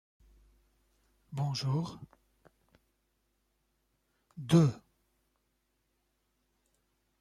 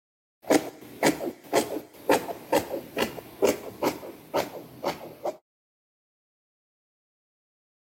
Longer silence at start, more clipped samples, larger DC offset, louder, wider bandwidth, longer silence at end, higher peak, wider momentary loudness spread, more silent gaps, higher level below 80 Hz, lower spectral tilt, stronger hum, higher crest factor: first, 1.3 s vs 0.45 s; neither; neither; about the same, -31 LUFS vs -29 LUFS; second, 12.5 kHz vs 16.5 kHz; second, 2.45 s vs 2.6 s; second, -14 dBFS vs -6 dBFS; first, 23 LU vs 10 LU; neither; about the same, -68 dBFS vs -64 dBFS; first, -7 dB/octave vs -3.5 dB/octave; neither; about the same, 24 dB vs 24 dB